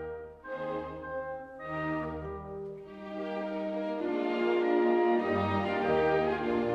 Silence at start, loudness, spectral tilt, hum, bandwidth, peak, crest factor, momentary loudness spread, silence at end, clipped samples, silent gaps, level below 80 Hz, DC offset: 0 s; -31 LUFS; -8 dB/octave; none; 6.6 kHz; -16 dBFS; 14 dB; 15 LU; 0 s; under 0.1%; none; -58 dBFS; under 0.1%